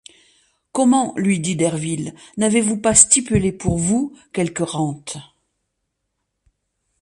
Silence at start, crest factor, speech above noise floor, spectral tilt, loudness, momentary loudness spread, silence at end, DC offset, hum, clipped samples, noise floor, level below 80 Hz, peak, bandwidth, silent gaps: 0.75 s; 20 dB; 57 dB; -4 dB/octave; -18 LUFS; 15 LU; 1.8 s; under 0.1%; none; under 0.1%; -76 dBFS; -44 dBFS; 0 dBFS; 11.5 kHz; none